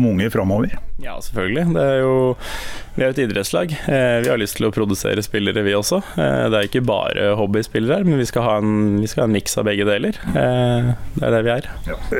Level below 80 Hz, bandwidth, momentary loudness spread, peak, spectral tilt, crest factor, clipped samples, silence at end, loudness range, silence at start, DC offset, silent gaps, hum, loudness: -36 dBFS; 17 kHz; 7 LU; -6 dBFS; -5.5 dB/octave; 12 dB; under 0.1%; 0 s; 2 LU; 0 s; under 0.1%; none; none; -19 LUFS